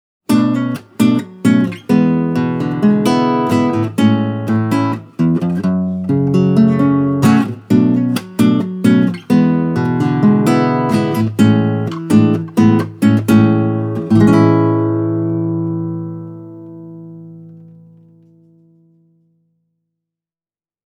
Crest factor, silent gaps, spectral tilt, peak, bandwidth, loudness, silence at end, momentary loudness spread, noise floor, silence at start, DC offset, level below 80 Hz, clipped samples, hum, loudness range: 14 dB; none; -8 dB/octave; 0 dBFS; 16 kHz; -14 LUFS; 3.25 s; 8 LU; under -90 dBFS; 0.3 s; under 0.1%; -52 dBFS; under 0.1%; none; 5 LU